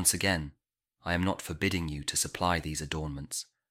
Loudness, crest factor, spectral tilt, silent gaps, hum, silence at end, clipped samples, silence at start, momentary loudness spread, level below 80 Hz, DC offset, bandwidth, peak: -31 LUFS; 24 dB; -3 dB/octave; none; none; 0.25 s; under 0.1%; 0 s; 9 LU; -48 dBFS; under 0.1%; 16.5 kHz; -8 dBFS